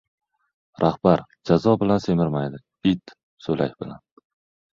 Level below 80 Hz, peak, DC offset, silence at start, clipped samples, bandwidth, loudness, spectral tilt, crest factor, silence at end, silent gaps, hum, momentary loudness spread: -52 dBFS; -2 dBFS; under 0.1%; 0.8 s; under 0.1%; 7.4 kHz; -22 LUFS; -8 dB/octave; 20 dB; 0.8 s; 3.23-3.37 s; none; 12 LU